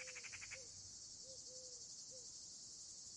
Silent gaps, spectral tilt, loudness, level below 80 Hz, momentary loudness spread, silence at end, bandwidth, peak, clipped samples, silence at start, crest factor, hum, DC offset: none; 0.5 dB/octave; -52 LUFS; -80 dBFS; 3 LU; 0 s; 11 kHz; -40 dBFS; under 0.1%; 0 s; 16 dB; none; under 0.1%